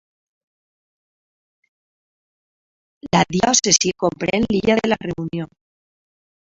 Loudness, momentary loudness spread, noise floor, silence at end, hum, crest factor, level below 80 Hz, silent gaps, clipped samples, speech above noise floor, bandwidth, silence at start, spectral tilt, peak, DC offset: -18 LUFS; 13 LU; under -90 dBFS; 1.05 s; none; 22 dB; -50 dBFS; none; under 0.1%; over 72 dB; 8.2 kHz; 3.05 s; -3 dB/octave; 0 dBFS; under 0.1%